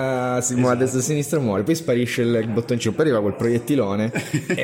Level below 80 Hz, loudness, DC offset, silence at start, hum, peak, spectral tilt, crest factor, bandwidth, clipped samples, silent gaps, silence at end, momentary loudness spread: -58 dBFS; -21 LUFS; under 0.1%; 0 s; none; -8 dBFS; -5.5 dB/octave; 12 dB; 16.5 kHz; under 0.1%; none; 0 s; 4 LU